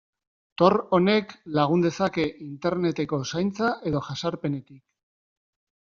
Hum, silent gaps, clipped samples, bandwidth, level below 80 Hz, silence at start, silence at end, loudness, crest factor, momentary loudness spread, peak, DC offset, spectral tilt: none; none; under 0.1%; 7.4 kHz; -60 dBFS; 0.6 s; 1.1 s; -25 LUFS; 22 dB; 9 LU; -4 dBFS; under 0.1%; -5.5 dB/octave